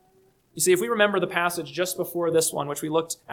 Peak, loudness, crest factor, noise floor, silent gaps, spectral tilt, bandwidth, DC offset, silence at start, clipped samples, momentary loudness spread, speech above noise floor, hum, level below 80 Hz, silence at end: -6 dBFS; -24 LUFS; 20 dB; -61 dBFS; none; -3 dB/octave; 19 kHz; under 0.1%; 0.55 s; under 0.1%; 7 LU; 37 dB; none; -68 dBFS; 0 s